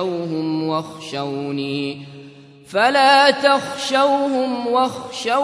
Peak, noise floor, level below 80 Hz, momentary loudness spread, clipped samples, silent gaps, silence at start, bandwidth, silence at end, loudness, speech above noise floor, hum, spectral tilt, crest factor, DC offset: 0 dBFS; -42 dBFS; -68 dBFS; 14 LU; under 0.1%; none; 0 s; 11 kHz; 0 s; -18 LUFS; 23 dB; none; -4 dB/octave; 18 dB; under 0.1%